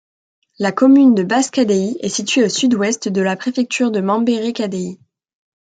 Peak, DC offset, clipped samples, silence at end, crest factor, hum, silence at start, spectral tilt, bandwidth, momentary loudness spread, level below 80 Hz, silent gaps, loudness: -2 dBFS; under 0.1%; under 0.1%; 0.7 s; 14 dB; none; 0.6 s; -4.5 dB/octave; 9.4 kHz; 10 LU; -64 dBFS; none; -16 LUFS